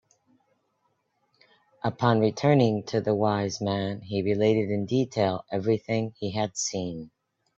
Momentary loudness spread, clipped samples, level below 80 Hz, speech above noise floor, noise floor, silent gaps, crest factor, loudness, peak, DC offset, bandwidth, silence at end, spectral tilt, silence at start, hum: 8 LU; under 0.1%; -64 dBFS; 48 dB; -73 dBFS; none; 22 dB; -26 LUFS; -6 dBFS; under 0.1%; 8.2 kHz; 0.5 s; -6 dB/octave; 1.85 s; none